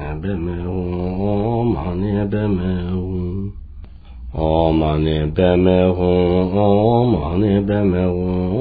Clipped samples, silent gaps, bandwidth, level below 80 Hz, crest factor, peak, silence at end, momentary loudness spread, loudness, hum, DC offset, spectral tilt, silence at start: under 0.1%; none; 4.8 kHz; -32 dBFS; 16 dB; -2 dBFS; 0 s; 9 LU; -18 LUFS; none; under 0.1%; -12 dB/octave; 0 s